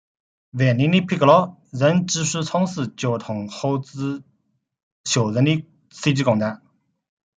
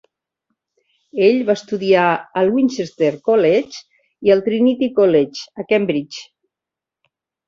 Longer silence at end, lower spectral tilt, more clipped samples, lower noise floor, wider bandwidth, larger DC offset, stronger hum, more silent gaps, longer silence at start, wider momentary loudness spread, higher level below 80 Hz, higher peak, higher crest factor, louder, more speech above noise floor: second, 0.85 s vs 1.25 s; about the same, -5.5 dB/octave vs -6 dB/octave; neither; second, -70 dBFS vs -86 dBFS; first, 9.6 kHz vs 7.6 kHz; neither; neither; first, 4.83-5.04 s vs none; second, 0.55 s vs 1.15 s; about the same, 12 LU vs 14 LU; about the same, -62 dBFS vs -62 dBFS; about the same, -2 dBFS vs -2 dBFS; about the same, 20 dB vs 16 dB; second, -21 LUFS vs -17 LUFS; second, 50 dB vs 70 dB